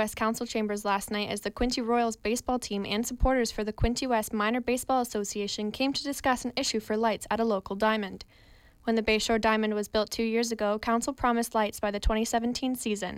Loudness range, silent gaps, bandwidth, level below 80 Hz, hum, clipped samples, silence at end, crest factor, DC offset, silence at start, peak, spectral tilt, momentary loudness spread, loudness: 2 LU; none; 16.5 kHz; -42 dBFS; none; under 0.1%; 0 s; 16 dB; under 0.1%; 0 s; -12 dBFS; -4 dB/octave; 5 LU; -29 LUFS